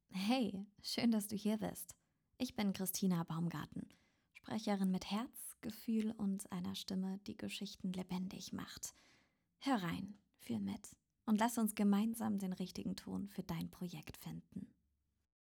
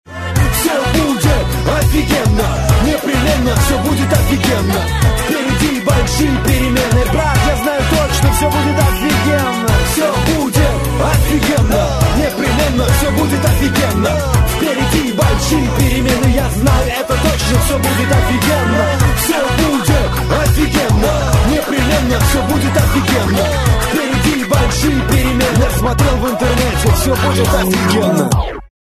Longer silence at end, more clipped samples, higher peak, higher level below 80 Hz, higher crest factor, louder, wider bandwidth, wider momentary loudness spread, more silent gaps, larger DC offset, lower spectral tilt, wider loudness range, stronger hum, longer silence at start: first, 0.9 s vs 0.25 s; neither; second, -22 dBFS vs 0 dBFS; second, -72 dBFS vs -20 dBFS; first, 20 dB vs 12 dB; second, -41 LUFS vs -13 LUFS; first, over 20 kHz vs 14 kHz; first, 14 LU vs 2 LU; neither; second, under 0.1% vs 0.1%; about the same, -5 dB/octave vs -5 dB/octave; first, 5 LU vs 0 LU; neither; about the same, 0.1 s vs 0.1 s